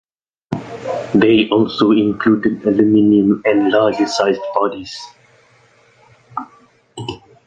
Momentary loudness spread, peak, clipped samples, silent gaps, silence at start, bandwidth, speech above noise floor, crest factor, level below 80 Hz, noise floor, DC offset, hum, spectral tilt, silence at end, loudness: 17 LU; -2 dBFS; under 0.1%; none; 0.5 s; 9 kHz; 38 dB; 14 dB; -52 dBFS; -52 dBFS; under 0.1%; none; -6 dB/octave; 0.3 s; -15 LUFS